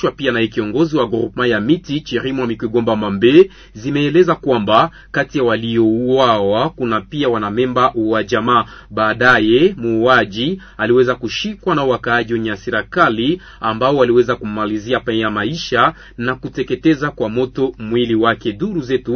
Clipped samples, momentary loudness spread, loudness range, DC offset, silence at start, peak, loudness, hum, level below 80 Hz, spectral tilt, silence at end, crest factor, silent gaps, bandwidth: under 0.1%; 8 LU; 3 LU; under 0.1%; 0 s; 0 dBFS; -16 LUFS; none; -44 dBFS; -6.5 dB/octave; 0 s; 16 dB; none; 6.6 kHz